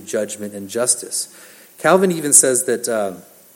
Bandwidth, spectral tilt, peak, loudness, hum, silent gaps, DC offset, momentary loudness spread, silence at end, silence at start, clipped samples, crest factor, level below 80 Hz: 17 kHz; -2.5 dB/octave; 0 dBFS; -16 LUFS; none; none; under 0.1%; 16 LU; 0.35 s; 0 s; under 0.1%; 18 dB; -72 dBFS